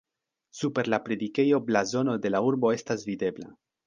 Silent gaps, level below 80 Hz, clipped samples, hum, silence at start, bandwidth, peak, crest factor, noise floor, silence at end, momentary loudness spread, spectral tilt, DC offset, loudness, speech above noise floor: none; -68 dBFS; under 0.1%; none; 0.55 s; 9.6 kHz; -8 dBFS; 18 dB; -70 dBFS; 0.35 s; 9 LU; -5.5 dB/octave; under 0.1%; -27 LUFS; 44 dB